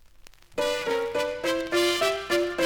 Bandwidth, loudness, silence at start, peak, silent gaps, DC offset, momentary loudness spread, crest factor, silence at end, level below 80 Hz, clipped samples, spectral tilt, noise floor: 19 kHz; -26 LUFS; 0.2 s; -12 dBFS; none; under 0.1%; 5 LU; 16 dB; 0 s; -56 dBFS; under 0.1%; -2.5 dB/octave; -50 dBFS